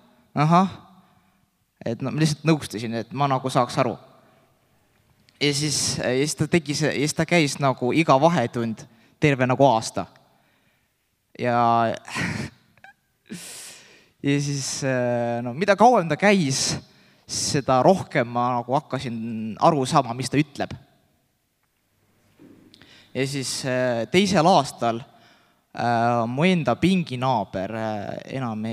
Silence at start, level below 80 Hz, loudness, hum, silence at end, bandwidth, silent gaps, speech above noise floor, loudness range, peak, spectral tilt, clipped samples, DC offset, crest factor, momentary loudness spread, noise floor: 0.35 s; -62 dBFS; -22 LUFS; none; 0 s; 15 kHz; none; 48 dB; 6 LU; -2 dBFS; -5 dB/octave; under 0.1%; under 0.1%; 22 dB; 14 LU; -70 dBFS